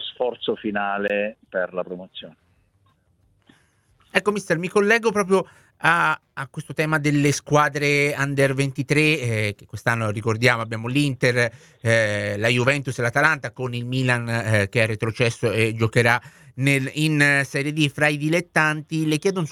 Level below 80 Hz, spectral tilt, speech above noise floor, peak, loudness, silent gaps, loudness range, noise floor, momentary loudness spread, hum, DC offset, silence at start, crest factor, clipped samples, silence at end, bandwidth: -58 dBFS; -5 dB/octave; 41 dB; 0 dBFS; -21 LUFS; none; 7 LU; -63 dBFS; 9 LU; none; under 0.1%; 0 s; 22 dB; under 0.1%; 0 s; 15.5 kHz